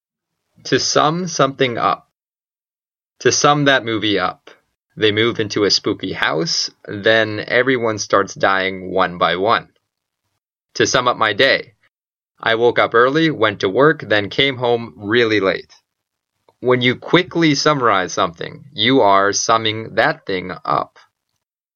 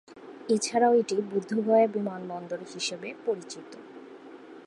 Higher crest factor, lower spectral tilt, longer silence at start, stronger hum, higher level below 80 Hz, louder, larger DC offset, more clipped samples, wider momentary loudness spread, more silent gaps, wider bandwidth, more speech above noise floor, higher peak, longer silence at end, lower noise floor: about the same, 18 dB vs 18 dB; about the same, -3.5 dB/octave vs -4 dB/octave; first, 0.65 s vs 0.1 s; neither; first, -58 dBFS vs -82 dBFS; first, -16 LUFS vs -27 LUFS; neither; neither; second, 8 LU vs 24 LU; neither; second, 7.4 kHz vs 11.5 kHz; first, over 74 dB vs 20 dB; first, 0 dBFS vs -10 dBFS; first, 0.9 s vs 0 s; first, under -90 dBFS vs -47 dBFS